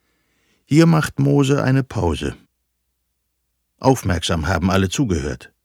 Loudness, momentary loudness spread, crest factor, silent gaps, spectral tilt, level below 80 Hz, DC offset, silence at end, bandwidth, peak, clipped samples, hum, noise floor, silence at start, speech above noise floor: -18 LUFS; 8 LU; 18 dB; none; -6 dB/octave; -38 dBFS; under 0.1%; 0.2 s; 16 kHz; -2 dBFS; under 0.1%; none; -72 dBFS; 0.7 s; 55 dB